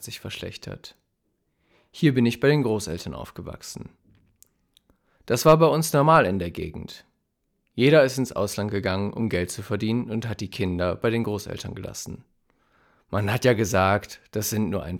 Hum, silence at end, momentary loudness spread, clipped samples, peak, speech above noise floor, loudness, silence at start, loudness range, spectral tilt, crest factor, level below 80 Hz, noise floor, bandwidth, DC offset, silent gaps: none; 0 s; 20 LU; under 0.1%; -4 dBFS; 51 dB; -23 LUFS; 0 s; 6 LU; -5.5 dB/octave; 20 dB; -54 dBFS; -74 dBFS; 18.5 kHz; under 0.1%; none